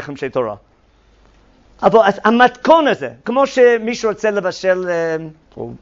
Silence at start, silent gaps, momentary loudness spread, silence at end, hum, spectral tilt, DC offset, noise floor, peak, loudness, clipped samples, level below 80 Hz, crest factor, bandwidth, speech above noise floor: 0 s; none; 13 LU; 0.05 s; none; -5 dB/octave; under 0.1%; -52 dBFS; 0 dBFS; -15 LUFS; under 0.1%; -52 dBFS; 16 dB; 7.6 kHz; 37 dB